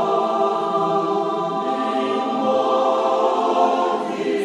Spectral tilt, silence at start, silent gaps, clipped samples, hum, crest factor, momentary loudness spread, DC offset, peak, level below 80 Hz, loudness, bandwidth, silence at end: -5.5 dB/octave; 0 s; none; under 0.1%; none; 14 dB; 4 LU; under 0.1%; -6 dBFS; -70 dBFS; -20 LUFS; 11 kHz; 0 s